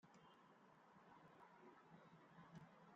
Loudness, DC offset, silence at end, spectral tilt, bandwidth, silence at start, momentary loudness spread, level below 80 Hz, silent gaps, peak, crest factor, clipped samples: -67 LUFS; under 0.1%; 0 s; -5 dB/octave; 7.2 kHz; 0 s; 5 LU; under -90 dBFS; none; -50 dBFS; 18 dB; under 0.1%